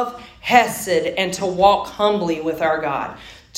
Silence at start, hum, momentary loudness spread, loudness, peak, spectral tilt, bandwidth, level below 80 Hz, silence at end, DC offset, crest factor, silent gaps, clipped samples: 0 s; none; 12 LU; -19 LUFS; 0 dBFS; -3.5 dB/octave; 16.5 kHz; -50 dBFS; 0 s; under 0.1%; 18 dB; none; under 0.1%